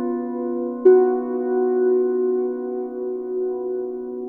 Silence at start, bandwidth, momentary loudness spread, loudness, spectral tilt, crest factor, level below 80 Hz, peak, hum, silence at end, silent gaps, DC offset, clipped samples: 0 s; 2.3 kHz; 12 LU; -21 LUFS; -10 dB/octave; 16 dB; -66 dBFS; -4 dBFS; none; 0 s; none; under 0.1%; under 0.1%